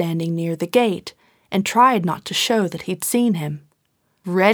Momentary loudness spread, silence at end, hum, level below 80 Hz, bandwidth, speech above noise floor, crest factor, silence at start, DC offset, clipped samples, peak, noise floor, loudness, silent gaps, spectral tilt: 15 LU; 0 s; none; -64 dBFS; over 20 kHz; 48 dB; 18 dB; 0 s; under 0.1%; under 0.1%; -2 dBFS; -67 dBFS; -20 LUFS; none; -4.5 dB/octave